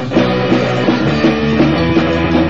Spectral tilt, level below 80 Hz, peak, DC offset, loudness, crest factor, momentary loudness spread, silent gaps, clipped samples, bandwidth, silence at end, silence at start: -7 dB/octave; -32 dBFS; 0 dBFS; 2%; -13 LUFS; 12 dB; 1 LU; none; under 0.1%; 7.6 kHz; 0 s; 0 s